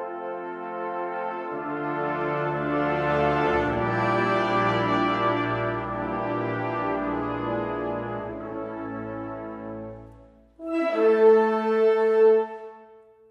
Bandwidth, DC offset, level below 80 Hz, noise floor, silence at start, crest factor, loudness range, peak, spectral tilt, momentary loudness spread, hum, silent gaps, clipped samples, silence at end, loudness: 7 kHz; under 0.1%; -52 dBFS; -51 dBFS; 0 s; 16 dB; 9 LU; -8 dBFS; -7.5 dB/octave; 15 LU; none; none; under 0.1%; 0.35 s; -25 LUFS